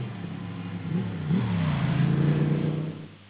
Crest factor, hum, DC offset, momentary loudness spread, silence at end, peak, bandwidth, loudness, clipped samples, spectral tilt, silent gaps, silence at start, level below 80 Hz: 14 dB; none; under 0.1%; 12 LU; 0 s; -12 dBFS; 4 kHz; -27 LUFS; under 0.1%; -12 dB/octave; none; 0 s; -48 dBFS